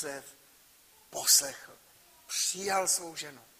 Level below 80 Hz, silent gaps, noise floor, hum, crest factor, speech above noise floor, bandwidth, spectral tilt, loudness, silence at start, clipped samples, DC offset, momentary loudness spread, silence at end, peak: -74 dBFS; none; -61 dBFS; none; 26 dB; 29 dB; 15.5 kHz; 0.5 dB/octave; -27 LUFS; 0 s; under 0.1%; under 0.1%; 19 LU; 0.2 s; -8 dBFS